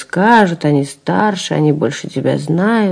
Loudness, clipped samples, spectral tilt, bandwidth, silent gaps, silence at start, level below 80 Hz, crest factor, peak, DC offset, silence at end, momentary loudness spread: -14 LUFS; 0.3%; -6 dB/octave; 10.5 kHz; none; 0 s; -58 dBFS; 14 dB; 0 dBFS; under 0.1%; 0 s; 7 LU